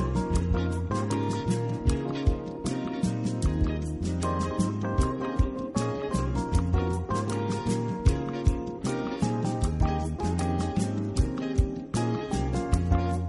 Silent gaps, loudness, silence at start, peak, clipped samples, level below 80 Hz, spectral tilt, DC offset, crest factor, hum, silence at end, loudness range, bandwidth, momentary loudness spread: none; -29 LUFS; 0 s; -10 dBFS; under 0.1%; -32 dBFS; -7 dB/octave; under 0.1%; 16 dB; none; 0 s; 1 LU; 11.5 kHz; 3 LU